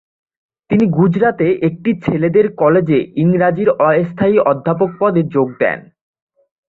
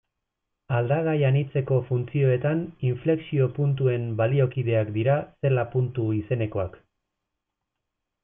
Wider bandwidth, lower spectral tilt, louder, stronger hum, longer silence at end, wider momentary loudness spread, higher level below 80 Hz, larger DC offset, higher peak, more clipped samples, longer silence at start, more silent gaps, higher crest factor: first, 4.2 kHz vs 3.7 kHz; second, -10.5 dB/octave vs -12.5 dB/octave; first, -14 LUFS vs -25 LUFS; neither; second, 0.95 s vs 1.45 s; about the same, 5 LU vs 5 LU; first, -52 dBFS vs -60 dBFS; neither; first, -2 dBFS vs -10 dBFS; neither; about the same, 0.7 s vs 0.7 s; neither; about the same, 14 dB vs 14 dB